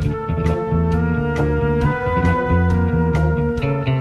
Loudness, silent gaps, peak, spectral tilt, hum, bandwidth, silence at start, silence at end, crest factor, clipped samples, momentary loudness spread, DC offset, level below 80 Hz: -19 LUFS; none; -6 dBFS; -9 dB/octave; none; 7.2 kHz; 0 s; 0 s; 12 dB; under 0.1%; 3 LU; under 0.1%; -26 dBFS